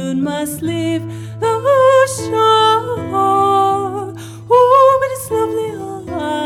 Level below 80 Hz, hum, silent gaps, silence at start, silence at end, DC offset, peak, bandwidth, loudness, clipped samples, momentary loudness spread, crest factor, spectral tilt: -52 dBFS; none; none; 0 s; 0 s; under 0.1%; -2 dBFS; 15.5 kHz; -14 LUFS; under 0.1%; 14 LU; 12 dB; -5 dB/octave